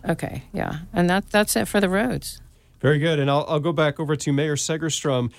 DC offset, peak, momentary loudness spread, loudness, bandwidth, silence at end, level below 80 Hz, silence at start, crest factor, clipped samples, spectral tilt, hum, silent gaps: under 0.1%; -6 dBFS; 9 LU; -22 LUFS; 16 kHz; 0.1 s; -46 dBFS; 0.05 s; 16 dB; under 0.1%; -5 dB/octave; none; none